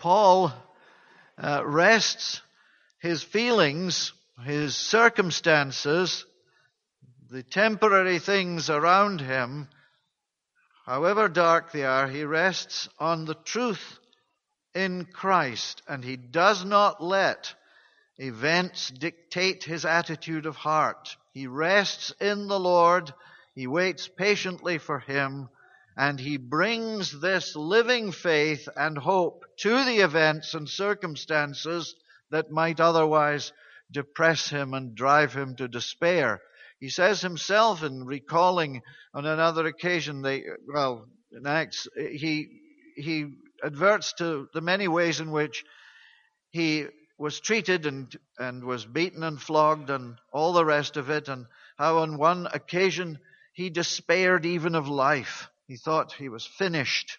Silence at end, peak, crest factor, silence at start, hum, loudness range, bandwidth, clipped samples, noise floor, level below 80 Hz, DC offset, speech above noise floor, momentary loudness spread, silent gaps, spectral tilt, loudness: 0.05 s; -4 dBFS; 22 dB; 0 s; none; 5 LU; 7.2 kHz; under 0.1%; -82 dBFS; -74 dBFS; under 0.1%; 56 dB; 15 LU; none; -4 dB/octave; -25 LUFS